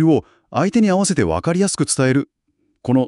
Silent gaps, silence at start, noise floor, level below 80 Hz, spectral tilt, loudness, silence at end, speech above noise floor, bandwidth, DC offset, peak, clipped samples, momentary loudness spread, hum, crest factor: none; 0 s; -67 dBFS; -50 dBFS; -5.5 dB/octave; -18 LUFS; 0 s; 50 dB; 12 kHz; under 0.1%; -4 dBFS; under 0.1%; 8 LU; none; 14 dB